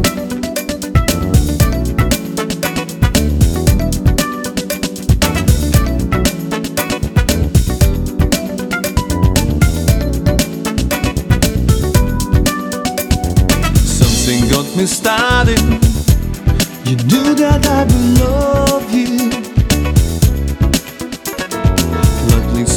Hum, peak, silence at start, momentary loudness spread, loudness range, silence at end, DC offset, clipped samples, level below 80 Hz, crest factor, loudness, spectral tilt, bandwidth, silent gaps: none; 0 dBFS; 0 s; 7 LU; 3 LU; 0 s; under 0.1%; under 0.1%; -18 dBFS; 12 dB; -14 LUFS; -5 dB/octave; 19 kHz; none